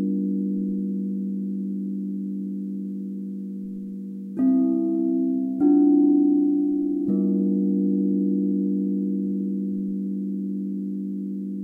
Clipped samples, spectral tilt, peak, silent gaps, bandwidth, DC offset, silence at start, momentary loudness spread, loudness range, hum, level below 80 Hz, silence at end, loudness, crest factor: under 0.1%; -13 dB/octave; -10 dBFS; none; 1.5 kHz; under 0.1%; 0 s; 13 LU; 8 LU; none; -70 dBFS; 0 s; -24 LUFS; 14 dB